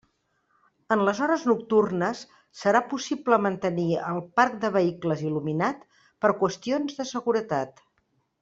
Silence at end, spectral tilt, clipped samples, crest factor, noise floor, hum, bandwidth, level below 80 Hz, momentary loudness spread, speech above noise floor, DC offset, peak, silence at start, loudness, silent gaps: 0.7 s; -6 dB/octave; under 0.1%; 20 dB; -72 dBFS; none; 7.8 kHz; -68 dBFS; 7 LU; 47 dB; under 0.1%; -6 dBFS; 0.9 s; -25 LUFS; none